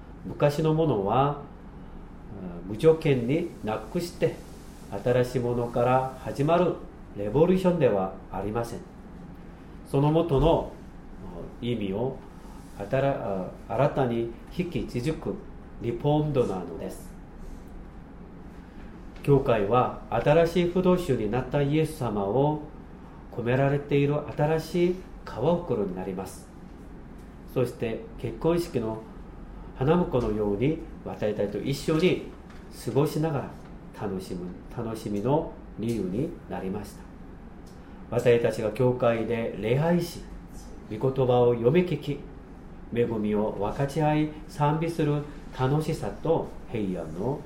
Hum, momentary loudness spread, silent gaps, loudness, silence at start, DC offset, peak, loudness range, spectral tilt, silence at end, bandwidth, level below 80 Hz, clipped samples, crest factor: none; 22 LU; none; -27 LUFS; 0 s; under 0.1%; -8 dBFS; 6 LU; -7.5 dB/octave; 0 s; 16 kHz; -44 dBFS; under 0.1%; 20 dB